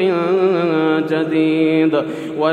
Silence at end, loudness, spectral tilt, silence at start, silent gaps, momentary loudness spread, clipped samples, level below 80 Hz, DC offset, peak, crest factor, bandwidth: 0 s; -16 LUFS; -7.5 dB/octave; 0 s; none; 5 LU; under 0.1%; -68 dBFS; under 0.1%; -2 dBFS; 14 dB; 9.2 kHz